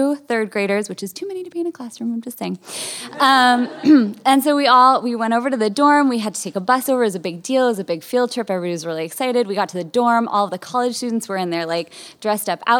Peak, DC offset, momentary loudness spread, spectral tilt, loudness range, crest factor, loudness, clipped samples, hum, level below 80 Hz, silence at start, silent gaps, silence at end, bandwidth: 0 dBFS; under 0.1%; 13 LU; -4 dB/octave; 6 LU; 18 dB; -18 LUFS; under 0.1%; none; -74 dBFS; 0 s; none; 0 s; 17.5 kHz